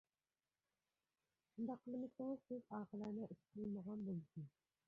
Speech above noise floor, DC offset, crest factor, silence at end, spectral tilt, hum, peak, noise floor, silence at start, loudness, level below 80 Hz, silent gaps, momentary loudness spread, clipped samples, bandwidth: over 41 dB; under 0.1%; 16 dB; 0.4 s; -10 dB/octave; none; -36 dBFS; under -90 dBFS; 1.55 s; -50 LUFS; -86 dBFS; none; 8 LU; under 0.1%; 6.4 kHz